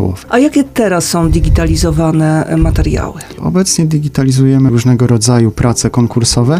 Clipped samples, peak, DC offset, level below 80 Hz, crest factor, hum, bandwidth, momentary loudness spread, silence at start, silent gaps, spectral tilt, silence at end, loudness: under 0.1%; 0 dBFS; under 0.1%; -20 dBFS; 10 dB; none; 16 kHz; 4 LU; 0 s; none; -5.5 dB/octave; 0 s; -11 LUFS